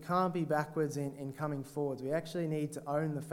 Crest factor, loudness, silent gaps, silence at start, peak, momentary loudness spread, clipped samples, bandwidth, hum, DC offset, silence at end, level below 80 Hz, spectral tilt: 18 dB; -36 LUFS; none; 0 s; -16 dBFS; 7 LU; under 0.1%; 16.5 kHz; none; under 0.1%; 0 s; -72 dBFS; -7 dB/octave